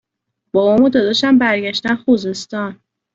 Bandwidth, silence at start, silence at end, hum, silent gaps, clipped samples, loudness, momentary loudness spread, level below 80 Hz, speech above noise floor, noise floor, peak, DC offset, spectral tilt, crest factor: 7.8 kHz; 0.55 s; 0.4 s; none; none; under 0.1%; -15 LUFS; 12 LU; -54 dBFS; 61 dB; -75 dBFS; -2 dBFS; under 0.1%; -5 dB/octave; 14 dB